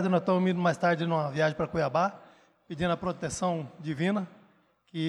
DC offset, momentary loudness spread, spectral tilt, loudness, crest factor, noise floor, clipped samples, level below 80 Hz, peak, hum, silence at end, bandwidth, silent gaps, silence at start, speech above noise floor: under 0.1%; 9 LU; -6 dB/octave; -29 LUFS; 16 dB; -65 dBFS; under 0.1%; -60 dBFS; -12 dBFS; none; 0 s; 11 kHz; none; 0 s; 37 dB